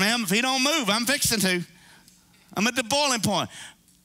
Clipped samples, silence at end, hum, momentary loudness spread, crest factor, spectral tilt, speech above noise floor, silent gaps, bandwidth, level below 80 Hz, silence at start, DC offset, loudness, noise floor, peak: under 0.1%; 0.35 s; none; 13 LU; 18 dB; -2.5 dB/octave; 32 dB; none; 16 kHz; -58 dBFS; 0 s; under 0.1%; -23 LUFS; -56 dBFS; -6 dBFS